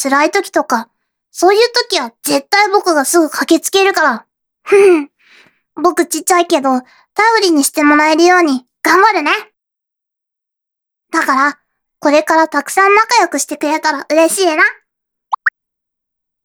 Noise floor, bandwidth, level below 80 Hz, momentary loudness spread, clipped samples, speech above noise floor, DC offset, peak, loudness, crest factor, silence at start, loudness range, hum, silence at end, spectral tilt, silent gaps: -81 dBFS; 19.5 kHz; -64 dBFS; 9 LU; under 0.1%; 69 dB; under 0.1%; 0 dBFS; -12 LUFS; 14 dB; 0 s; 4 LU; none; 0.95 s; -1 dB/octave; none